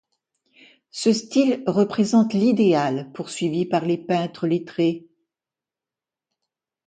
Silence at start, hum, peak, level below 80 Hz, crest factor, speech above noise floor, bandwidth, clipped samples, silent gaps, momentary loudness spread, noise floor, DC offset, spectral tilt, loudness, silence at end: 0.95 s; none; -6 dBFS; -68 dBFS; 16 dB; 69 dB; 9.4 kHz; under 0.1%; none; 8 LU; -89 dBFS; under 0.1%; -6 dB/octave; -21 LUFS; 1.9 s